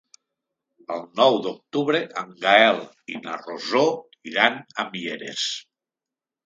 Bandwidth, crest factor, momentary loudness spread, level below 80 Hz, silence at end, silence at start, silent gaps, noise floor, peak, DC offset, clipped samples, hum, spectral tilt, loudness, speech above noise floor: 9.4 kHz; 24 dB; 16 LU; -76 dBFS; 0.85 s; 0.9 s; none; -89 dBFS; 0 dBFS; under 0.1%; under 0.1%; none; -3.5 dB/octave; -22 LUFS; 67 dB